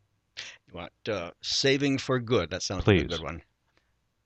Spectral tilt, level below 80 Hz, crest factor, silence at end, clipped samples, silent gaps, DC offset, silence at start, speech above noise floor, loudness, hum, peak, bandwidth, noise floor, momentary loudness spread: -4.5 dB/octave; -48 dBFS; 22 dB; 0.85 s; under 0.1%; none; under 0.1%; 0.35 s; 44 dB; -27 LUFS; none; -8 dBFS; 8.8 kHz; -71 dBFS; 18 LU